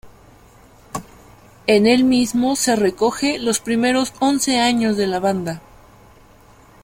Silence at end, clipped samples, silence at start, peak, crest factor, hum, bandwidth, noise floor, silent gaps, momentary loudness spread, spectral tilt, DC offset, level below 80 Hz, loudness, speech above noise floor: 1.25 s; under 0.1%; 0.05 s; -2 dBFS; 16 dB; none; 16.5 kHz; -48 dBFS; none; 16 LU; -3.5 dB/octave; under 0.1%; -50 dBFS; -18 LUFS; 31 dB